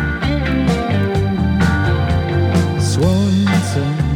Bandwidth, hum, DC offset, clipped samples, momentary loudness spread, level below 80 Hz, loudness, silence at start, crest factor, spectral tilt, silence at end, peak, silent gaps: 14 kHz; none; under 0.1%; under 0.1%; 3 LU; -26 dBFS; -16 LUFS; 0 s; 14 dB; -6.5 dB/octave; 0 s; -2 dBFS; none